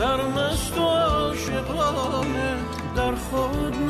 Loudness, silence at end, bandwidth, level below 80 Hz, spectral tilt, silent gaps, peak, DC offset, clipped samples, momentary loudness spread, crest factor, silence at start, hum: -24 LUFS; 0 s; 13.5 kHz; -36 dBFS; -5 dB/octave; none; -12 dBFS; under 0.1%; under 0.1%; 6 LU; 12 dB; 0 s; none